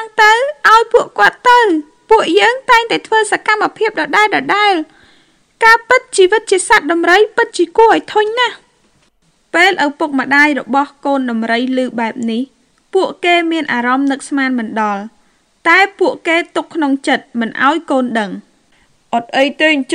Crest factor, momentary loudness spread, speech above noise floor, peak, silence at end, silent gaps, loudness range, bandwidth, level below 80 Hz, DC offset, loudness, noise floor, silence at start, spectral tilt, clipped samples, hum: 14 dB; 9 LU; 43 dB; 0 dBFS; 0 s; none; 5 LU; 19 kHz; -54 dBFS; under 0.1%; -12 LUFS; -56 dBFS; 0 s; -2.5 dB/octave; 0.6%; none